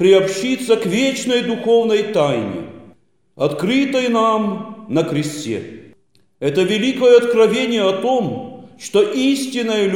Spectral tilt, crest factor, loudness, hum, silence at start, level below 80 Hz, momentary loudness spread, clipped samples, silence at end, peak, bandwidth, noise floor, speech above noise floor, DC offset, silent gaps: -5 dB/octave; 16 dB; -17 LUFS; none; 0 s; -62 dBFS; 12 LU; under 0.1%; 0 s; -2 dBFS; 16.5 kHz; -56 dBFS; 40 dB; 0.2%; none